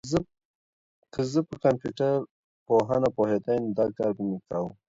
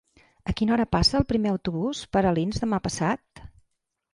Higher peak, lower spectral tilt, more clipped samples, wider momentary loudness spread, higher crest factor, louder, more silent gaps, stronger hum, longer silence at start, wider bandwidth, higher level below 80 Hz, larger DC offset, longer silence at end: about the same, -8 dBFS vs -6 dBFS; first, -7 dB/octave vs -5.5 dB/octave; neither; about the same, 8 LU vs 8 LU; about the same, 20 dB vs 18 dB; about the same, -27 LUFS vs -25 LUFS; first, 0.45-1.02 s, 2.31-2.66 s vs none; neither; second, 0.05 s vs 0.45 s; second, 7.8 kHz vs 11.5 kHz; second, -58 dBFS vs -40 dBFS; neither; second, 0.15 s vs 0.65 s